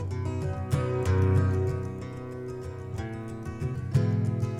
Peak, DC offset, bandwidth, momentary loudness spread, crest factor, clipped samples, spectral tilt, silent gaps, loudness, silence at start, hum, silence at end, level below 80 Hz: -12 dBFS; under 0.1%; 11.5 kHz; 13 LU; 16 dB; under 0.1%; -8 dB/octave; none; -29 LUFS; 0 s; none; 0 s; -46 dBFS